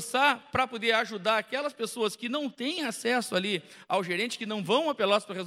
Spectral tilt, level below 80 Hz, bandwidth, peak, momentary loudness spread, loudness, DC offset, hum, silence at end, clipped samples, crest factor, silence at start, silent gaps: -3.5 dB/octave; -68 dBFS; 16 kHz; -10 dBFS; 7 LU; -28 LUFS; under 0.1%; none; 0 s; under 0.1%; 20 dB; 0 s; none